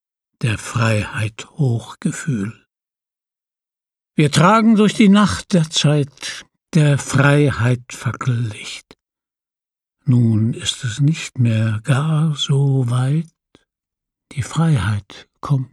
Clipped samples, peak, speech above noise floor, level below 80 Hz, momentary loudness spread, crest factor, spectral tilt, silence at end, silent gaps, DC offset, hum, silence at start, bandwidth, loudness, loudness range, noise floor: under 0.1%; 0 dBFS; 70 dB; -52 dBFS; 14 LU; 18 dB; -6 dB/octave; 0.05 s; none; under 0.1%; none; 0.4 s; 12 kHz; -17 LUFS; 7 LU; -87 dBFS